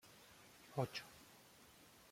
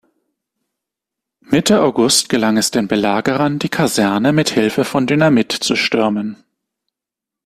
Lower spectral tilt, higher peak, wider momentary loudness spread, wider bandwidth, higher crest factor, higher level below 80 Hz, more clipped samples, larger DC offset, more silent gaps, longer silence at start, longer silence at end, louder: about the same, -5 dB/octave vs -4 dB/octave; second, -26 dBFS vs 0 dBFS; first, 19 LU vs 5 LU; about the same, 16.5 kHz vs 15 kHz; first, 26 dB vs 16 dB; second, -80 dBFS vs -54 dBFS; neither; neither; neither; second, 0 s vs 1.5 s; second, 0 s vs 1.1 s; second, -47 LUFS vs -15 LUFS